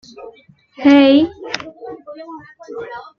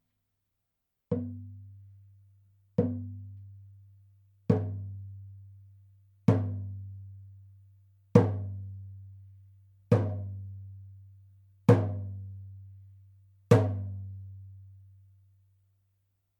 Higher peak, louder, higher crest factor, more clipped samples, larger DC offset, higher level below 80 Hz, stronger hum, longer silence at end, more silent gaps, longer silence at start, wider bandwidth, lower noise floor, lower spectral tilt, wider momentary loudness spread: first, 0 dBFS vs -4 dBFS; first, -13 LUFS vs -30 LUFS; second, 18 dB vs 30 dB; neither; neither; first, -58 dBFS vs -66 dBFS; neither; second, 0.15 s vs 1.6 s; neither; second, 0.25 s vs 1.1 s; second, 6.8 kHz vs 9.2 kHz; second, -35 dBFS vs -83 dBFS; second, -5 dB/octave vs -9 dB/octave; about the same, 24 LU vs 26 LU